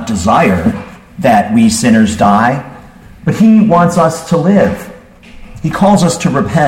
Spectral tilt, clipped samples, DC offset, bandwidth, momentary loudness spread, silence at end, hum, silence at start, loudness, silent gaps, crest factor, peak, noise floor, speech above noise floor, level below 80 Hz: -6 dB/octave; under 0.1%; under 0.1%; 15.5 kHz; 12 LU; 0 s; none; 0 s; -10 LUFS; none; 10 dB; 0 dBFS; -34 dBFS; 25 dB; -36 dBFS